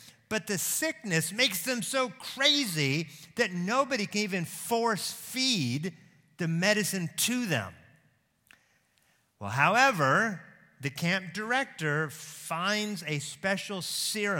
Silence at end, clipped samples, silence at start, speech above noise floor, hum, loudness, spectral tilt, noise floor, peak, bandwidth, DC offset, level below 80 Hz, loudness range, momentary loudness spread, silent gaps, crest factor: 0 s; under 0.1%; 0 s; 40 dB; none; -29 LUFS; -3 dB/octave; -69 dBFS; -8 dBFS; 17.5 kHz; under 0.1%; -76 dBFS; 4 LU; 11 LU; none; 22 dB